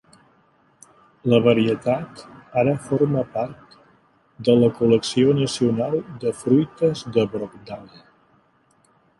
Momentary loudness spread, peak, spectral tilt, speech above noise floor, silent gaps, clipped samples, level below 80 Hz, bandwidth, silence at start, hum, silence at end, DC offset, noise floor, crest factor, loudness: 14 LU; -2 dBFS; -6.5 dB/octave; 40 dB; none; under 0.1%; -58 dBFS; 11.5 kHz; 1.25 s; none; 1.35 s; under 0.1%; -61 dBFS; 20 dB; -21 LUFS